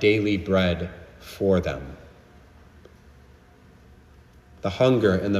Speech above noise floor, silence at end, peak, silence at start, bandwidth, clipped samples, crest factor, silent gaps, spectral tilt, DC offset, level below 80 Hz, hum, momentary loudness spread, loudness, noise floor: 30 dB; 0 s; -8 dBFS; 0 s; 14.5 kHz; under 0.1%; 18 dB; none; -7 dB/octave; under 0.1%; -48 dBFS; none; 22 LU; -23 LUFS; -52 dBFS